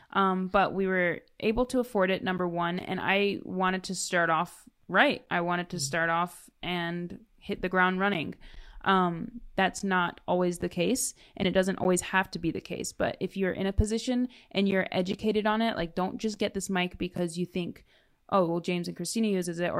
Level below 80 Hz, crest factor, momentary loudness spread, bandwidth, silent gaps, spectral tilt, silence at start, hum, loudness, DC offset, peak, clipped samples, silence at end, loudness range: -48 dBFS; 20 dB; 8 LU; 15 kHz; none; -4.5 dB/octave; 0.15 s; none; -29 LUFS; under 0.1%; -8 dBFS; under 0.1%; 0 s; 3 LU